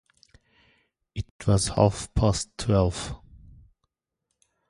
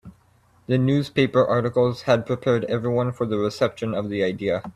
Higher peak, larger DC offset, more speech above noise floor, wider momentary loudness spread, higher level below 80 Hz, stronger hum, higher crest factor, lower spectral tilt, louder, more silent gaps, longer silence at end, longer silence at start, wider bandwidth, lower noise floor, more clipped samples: about the same, -4 dBFS vs -6 dBFS; neither; first, 58 dB vs 37 dB; first, 15 LU vs 5 LU; first, -40 dBFS vs -56 dBFS; neither; first, 22 dB vs 16 dB; second, -5.5 dB/octave vs -7.5 dB/octave; second, -25 LUFS vs -22 LUFS; first, 1.31-1.39 s vs none; first, 1.55 s vs 0.05 s; first, 1.15 s vs 0.05 s; about the same, 11.5 kHz vs 12.5 kHz; first, -82 dBFS vs -58 dBFS; neither